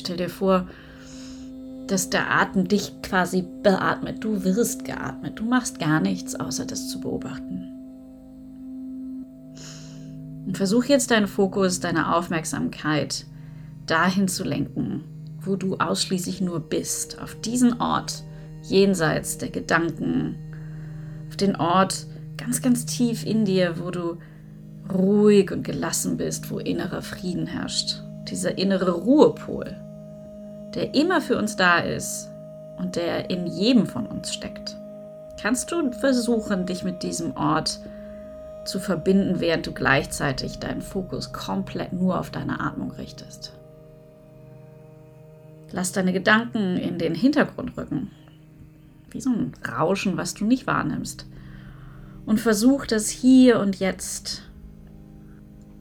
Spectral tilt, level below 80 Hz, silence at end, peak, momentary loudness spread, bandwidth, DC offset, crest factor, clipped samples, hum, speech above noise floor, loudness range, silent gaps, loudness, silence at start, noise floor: -4.5 dB/octave; -50 dBFS; 0 s; -2 dBFS; 19 LU; 19 kHz; under 0.1%; 22 dB; under 0.1%; none; 25 dB; 6 LU; none; -24 LUFS; 0 s; -48 dBFS